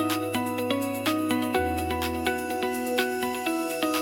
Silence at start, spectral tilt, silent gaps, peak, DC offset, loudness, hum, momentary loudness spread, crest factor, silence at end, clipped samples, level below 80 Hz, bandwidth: 0 s; -4 dB/octave; none; -8 dBFS; under 0.1%; -27 LUFS; none; 3 LU; 18 dB; 0 s; under 0.1%; -52 dBFS; 17 kHz